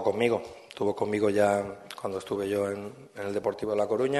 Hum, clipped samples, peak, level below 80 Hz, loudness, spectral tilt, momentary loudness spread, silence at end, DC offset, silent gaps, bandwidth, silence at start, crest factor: none; under 0.1%; -10 dBFS; -66 dBFS; -29 LUFS; -5.5 dB/octave; 13 LU; 0 s; under 0.1%; none; 12.5 kHz; 0 s; 18 dB